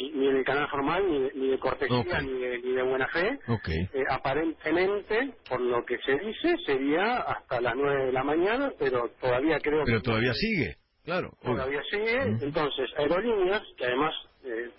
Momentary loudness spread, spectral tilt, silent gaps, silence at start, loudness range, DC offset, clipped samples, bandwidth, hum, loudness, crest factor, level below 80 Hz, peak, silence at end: 5 LU; -10 dB/octave; none; 0 s; 2 LU; under 0.1%; under 0.1%; 5.8 kHz; none; -28 LUFS; 14 dB; -50 dBFS; -14 dBFS; 0.05 s